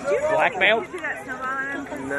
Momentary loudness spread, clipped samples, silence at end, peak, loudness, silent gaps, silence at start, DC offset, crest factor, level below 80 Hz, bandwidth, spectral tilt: 11 LU; under 0.1%; 0 s; -4 dBFS; -23 LUFS; none; 0 s; under 0.1%; 20 dB; -56 dBFS; 12.5 kHz; -3.5 dB/octave